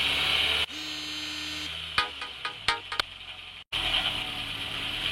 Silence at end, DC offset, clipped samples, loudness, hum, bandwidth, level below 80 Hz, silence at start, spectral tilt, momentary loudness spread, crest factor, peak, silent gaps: 0 s; under 0.1%; under 0.1%; -28 LUFS; none; 16.5 kHz; -50 dBFS; 0 s; -1.5 dB/octave; 11 LU; 22 dB; -10 dBFS; 3.67-3.71 s